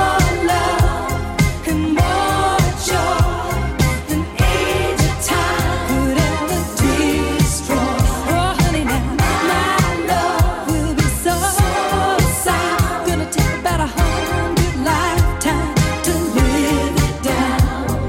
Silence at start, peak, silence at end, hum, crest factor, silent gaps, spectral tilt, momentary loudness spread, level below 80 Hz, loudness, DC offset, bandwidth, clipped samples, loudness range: 0 s; -4 dBFS; 0 s; none; 14 dB; none; -5 dB/octave; 3 LU; -24 dBFS; -17 LUFS; under 0.1%; 17 kHz; under 0.1%; 1 LU